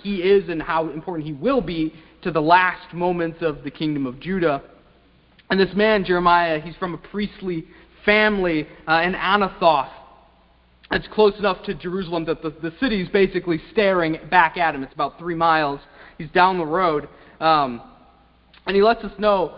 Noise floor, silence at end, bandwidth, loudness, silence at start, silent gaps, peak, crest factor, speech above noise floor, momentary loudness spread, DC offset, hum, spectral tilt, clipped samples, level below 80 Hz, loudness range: -56 dBFS; 0 s; 5.6 kHz; -21 LUFS; 0.05 s; none; 0 dBFS; 20 dB; 35 dB; 12 LU; under 0.1%; none; -10 dB/octave; under 0.1%; -48 dBFS; 3 LU